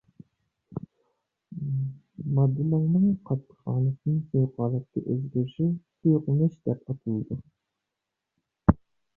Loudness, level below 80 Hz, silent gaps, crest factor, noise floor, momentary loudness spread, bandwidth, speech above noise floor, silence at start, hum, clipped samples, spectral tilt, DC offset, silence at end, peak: -27 LUFS; -48 dBFS; none; 24 dB; -85 dBFS; 13 LU; 3.2 kHz; 60 dB; 0.7 s; none; under 0.1%; -12.5 dB/octave; under 0.1%; 0.4 s; -2 dBFS